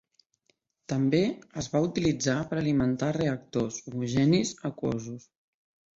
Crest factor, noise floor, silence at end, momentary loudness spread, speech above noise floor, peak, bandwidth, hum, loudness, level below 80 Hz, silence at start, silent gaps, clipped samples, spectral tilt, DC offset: 16 dB; -73 dBFS; 0.75 s; 9 LU; 45 dB; -12 dBFS; 8 kHz; none; -28 LUFS; -58 dBFS; 0.9 s; none; under 0.1%; -6 dB/octave; under 0.1%